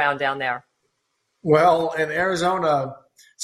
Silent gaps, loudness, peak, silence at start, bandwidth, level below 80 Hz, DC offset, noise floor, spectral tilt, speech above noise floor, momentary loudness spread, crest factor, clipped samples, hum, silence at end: none; -21 LUFS; -4 dBFS; 0 s; 13.5 kHz; -62 dBFS; under 0.1%; -73 dBFS; -5 dB/octave; 53 dB; 14 LU; 18 dB; under 0.1%; none; 0 s